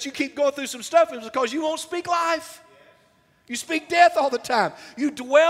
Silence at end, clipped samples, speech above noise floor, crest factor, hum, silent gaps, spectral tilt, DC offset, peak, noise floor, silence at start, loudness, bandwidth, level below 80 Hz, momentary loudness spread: 0 s; under 0.1%; 38 dB; 20 dB; none; none; -2.5 dB/octave; under 0.1%; -2 dBFS; -60 dBFS; 0 s; -23 LUFS; 15.5 kHz; -70 dBFS; 11 LU